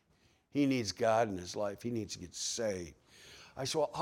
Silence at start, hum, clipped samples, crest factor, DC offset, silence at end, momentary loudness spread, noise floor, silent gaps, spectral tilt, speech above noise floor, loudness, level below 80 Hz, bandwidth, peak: 0.55 s; none; under 0.1%; 18 dB; under 0.1%; 0 s; 17 LU; -70 dBFS; none; -4 dB/octave; 36 dB; -35 LUFS; -70 dBFS; 16.5 kHz; -18 dBFS